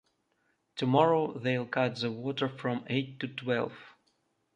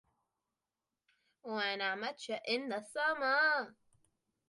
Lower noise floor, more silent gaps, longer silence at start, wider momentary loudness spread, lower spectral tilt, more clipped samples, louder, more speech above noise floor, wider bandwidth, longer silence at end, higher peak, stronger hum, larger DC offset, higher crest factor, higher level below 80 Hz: second, -75 dBFS vs under -90 dBFS; neither; second, 0.75 s vs 1.45 s; about the same, 11 LU vs 12 LU; first, -7 dB/octave vs -2.5 dB/octave; neither; first, -31 LUFS vs -35 LUFS; second, 45 dB vs over 55 dB; second, 9.8 kHz vs 11.5 kHz; second, 0.65 s vs 0.8 s; first, -10 dBFS vs -20 dBFS; neither; neither; about the same, 22 dB vs 18 dB; first, -74 dBFS vs -88 dBFS